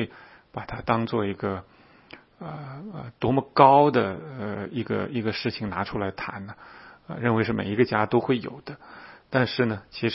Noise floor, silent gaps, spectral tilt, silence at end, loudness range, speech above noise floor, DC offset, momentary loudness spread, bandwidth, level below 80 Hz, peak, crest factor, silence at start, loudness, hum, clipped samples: -50 dBFS; none; -10.5 dB/octave; 0 s; 7 LU; 25 dB; under 0.1%; 19 LU; 5.8 kHz; -56 dBFS; -2 dBFS; 24 dB; 0 s; -25 LUFS; none; under 0.1%